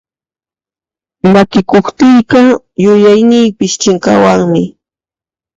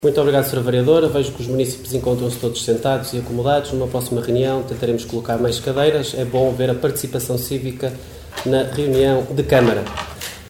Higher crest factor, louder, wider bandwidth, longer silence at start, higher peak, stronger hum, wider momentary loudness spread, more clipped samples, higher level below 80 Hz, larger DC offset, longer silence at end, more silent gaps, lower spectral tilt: second, 10 dB vs 16 dB; first, -8 LUFS vs -19 LUFS; second, 7.8 kHz vs 17.5 kHz; first, 1.25 s vs 0 s; about the same, 0 dBFS vs -2 dBFS; neither; second, 6 LU vs 9 LU; first, 0.2% vs under 0.1%; about the same, -46 dBFS vs -42 dBFS; second, under 0.1% vs 0.1%; first, 0.85 s vs 0 s; neither; about the same, -5.5 dB/octave vs -5.5 dB/octave